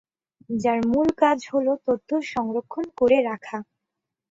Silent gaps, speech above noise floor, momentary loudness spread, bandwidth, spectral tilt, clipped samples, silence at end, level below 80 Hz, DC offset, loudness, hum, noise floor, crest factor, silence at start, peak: none; 61 dB; 12 LU; 7.8 kHz; -6 dB/octave; under 0.1%; 0.65 s; -58 dBFS; under 0.1%; -23 LUFS; none; -84 dBFS; 18 dB; 0.5 s; -6 dBFS